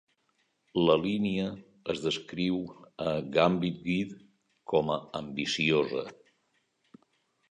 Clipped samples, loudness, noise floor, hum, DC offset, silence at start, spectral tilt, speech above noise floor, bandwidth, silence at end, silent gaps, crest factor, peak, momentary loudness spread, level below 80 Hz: under 0.1%; -30 LUFS; -75 dBFS; none; under 0.1%; 0.75 s; -5.5 dB/octave; 45 dB; 10 kHz; 1.4 s; none; 20 dB; -10 dBFS; 11 LU; -62 dBFS